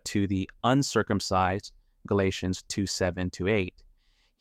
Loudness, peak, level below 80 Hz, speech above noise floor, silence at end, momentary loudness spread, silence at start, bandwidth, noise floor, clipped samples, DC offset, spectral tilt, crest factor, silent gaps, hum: -28 LUFS; -10 dBFS; -54 dBFS; 38 dB; 0.7 s; 7 LU; 0.05 s; 15.5 kHz; -65 dBFS; under 0.1%; under 0.1%; -5 dB/octave; 18 dB; none; none